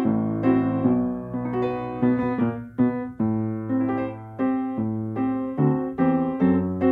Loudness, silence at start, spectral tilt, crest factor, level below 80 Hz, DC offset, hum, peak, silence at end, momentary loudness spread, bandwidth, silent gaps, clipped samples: -24 LUFS; 0 s; -11 dB/octave; 16 dB; -54 dBFS; under 0.1%; none; -8 dBFS; 0 s; 6 LU; 4 kHz; none; under 0.1%